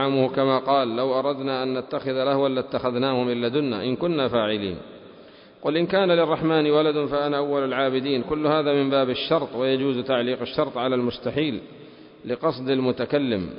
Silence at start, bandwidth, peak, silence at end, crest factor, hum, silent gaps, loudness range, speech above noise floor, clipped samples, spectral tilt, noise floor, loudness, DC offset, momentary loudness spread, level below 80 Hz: 0 s; 5.4 kHz; -8 dBFS; 0 s; 16 dB; none; none; 4 LU; 25 dB; under 0.1%; -10.5 dB/octave; -48 dBFS; -23 LUFS; under 0.1%; 6 LU; -56 dBFS